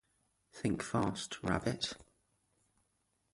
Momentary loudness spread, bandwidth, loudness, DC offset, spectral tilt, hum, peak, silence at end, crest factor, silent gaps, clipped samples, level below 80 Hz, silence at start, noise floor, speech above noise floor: 9 LU; 11.5 kHz; -37 LUFS; under 0.1%; -5 dB/octave; none; -16 dBFS; 1.3 s; 24 dB; none; under 0.1%; -60 dBFS; 0.55 s; -80 dBFS; 43 dB